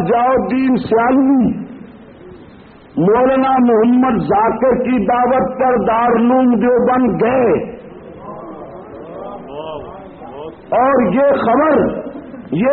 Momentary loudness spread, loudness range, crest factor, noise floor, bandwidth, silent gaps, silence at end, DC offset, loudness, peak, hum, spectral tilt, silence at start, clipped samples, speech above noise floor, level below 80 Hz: 20 LU; 8 LU; 12 dB; -40 dBFS; 4.5 kHz; none; 0 s; under 0.1%; -13 LUFS; -4 dBFS; none; -6.5 dB/octave; 0 s; under 0.1%; 27 dB; -44 dBFS